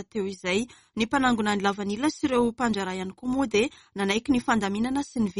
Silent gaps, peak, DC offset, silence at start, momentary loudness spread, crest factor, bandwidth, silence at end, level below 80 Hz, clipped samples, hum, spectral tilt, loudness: none; -8 dBFS; under 0.1%; 0 s; 7 LU; 18 dB; 11.5 kHz; 0 s; -54 dBFS; under 0.1%; none; -4.5 dB/octave; -26 LUFS